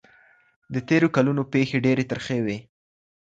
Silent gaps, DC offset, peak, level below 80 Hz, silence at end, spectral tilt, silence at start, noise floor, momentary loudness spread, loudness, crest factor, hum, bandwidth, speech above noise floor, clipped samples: none; under 0.1%; -6 dBFS; -60 dBFS; 0.6 s; -7 dB/octave; 0.7 s; -57 dBFS; 12 LU; -23 LUFS; 18 dB; none; 7.8 kHz; 35 dB; under 0.1%